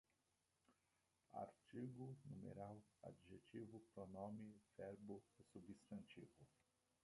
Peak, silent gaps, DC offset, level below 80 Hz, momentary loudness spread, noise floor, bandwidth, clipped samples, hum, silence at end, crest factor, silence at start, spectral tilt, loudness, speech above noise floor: -40 dBFS; none; under 0.1%; -84 dBFS; 9 LU; -88 dBFS; 11 kHz; under 0.1%; none; 0.55 s; 20 dB; 0.7 s; -7.5 dB/octave; -59 LUFS; 30 dB